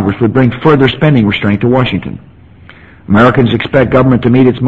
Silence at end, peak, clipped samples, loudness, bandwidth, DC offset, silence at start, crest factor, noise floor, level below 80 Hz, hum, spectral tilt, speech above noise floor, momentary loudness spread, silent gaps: 0 s; 0 dBFS; 0.5%; -9 LUFS; 7.2 kHz; under 0.1%; 0 s; 10 dB; -37 dBFS; -34 dBFS; none; -9 dB/octave; 28 dB; 6 LU; none